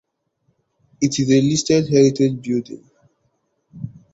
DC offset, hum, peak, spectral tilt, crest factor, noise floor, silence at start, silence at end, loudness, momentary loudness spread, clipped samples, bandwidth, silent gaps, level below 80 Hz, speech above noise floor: under 0.1%; none; -2 dBFS; -5.5 dB/octave; 18 dB; -68 dBFS; 1 s; 0.25 s; -17 LUFS; 21 LU; under 0.1%; 8 kHz; none; -54 dBFS; 51 dB